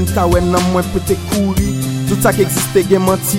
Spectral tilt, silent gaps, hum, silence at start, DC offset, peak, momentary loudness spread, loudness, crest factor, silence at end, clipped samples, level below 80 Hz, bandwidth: -5.5 dB/octave; none; none; 0 s; under 0.1%; 0 dBFS; 4 LU; -14 LUFS; 14 dB; 0 s; under 0.1%; -28 dBFS; 17 kHz